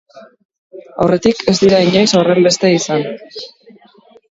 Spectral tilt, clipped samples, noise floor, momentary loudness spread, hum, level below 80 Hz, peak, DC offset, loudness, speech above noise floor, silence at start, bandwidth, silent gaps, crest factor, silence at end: -5 dB/octave; under 0.1%; -46 dBFS; 20 LU; none; -50 dBFS; 0 dBFS; under 0.1%; -12 LUFS; 34 dB; 0.15 s; 8 kHz; 0.45-0.49 s, 0.58-0.70 s; 14 dB; 0.85 s